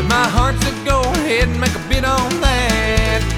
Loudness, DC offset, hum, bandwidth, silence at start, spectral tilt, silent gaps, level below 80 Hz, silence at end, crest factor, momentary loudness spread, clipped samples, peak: -16 LUFS; under 0.1%; none; 16.5 kHz; 0 s; -4.5 dB/octave; none; -22 dBFS; 0 s; 14 dB; 3 LU; under 0.1%; -2 dBFS